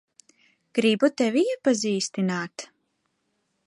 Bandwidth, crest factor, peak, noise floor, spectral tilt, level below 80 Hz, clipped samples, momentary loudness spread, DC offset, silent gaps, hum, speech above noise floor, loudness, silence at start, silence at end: 11.5 kHz; 20 dB; -8 dBFS; -74 dBFS; -4.5 dB/octave; -76 dBFS; under 0.1%; 13 LU; under 0.1%; none; none; 51 dB; -24 LUFS; 0.75 s; 1 s